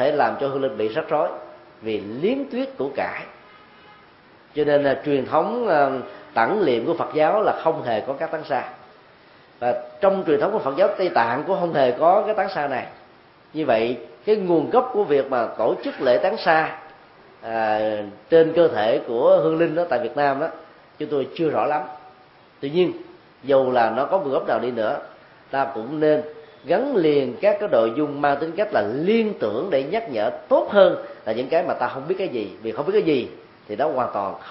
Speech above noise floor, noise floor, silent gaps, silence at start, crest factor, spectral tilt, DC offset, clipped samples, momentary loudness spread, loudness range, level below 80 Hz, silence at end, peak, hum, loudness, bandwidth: 30 dB; -51 dBFS; none; 0 s; 20 dB; -10.5 dB/octave; under 0.1%; under 0.1%; 10 LU; 4 LU; -64 dBFS; 0 s; -2 dBFS; none; -21 LUFS; 5.8 kHz